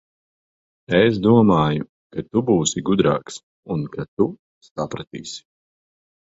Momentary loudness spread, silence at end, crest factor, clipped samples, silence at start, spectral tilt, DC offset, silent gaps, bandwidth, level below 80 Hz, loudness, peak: 18 LU; 0.85 s; 18 dB; under 0.1%; 0.9 s; -5.5 dB/octave; under 0.1%; 1.89-2.10 s, 3.43-3.63 s, 4.08-4.17 s, 4.39-4.61 s, 4.71-4.75 s, 5.07-5.11 s; 8 kHz; -50 dBFS; -20 LUFS; -2 dBFS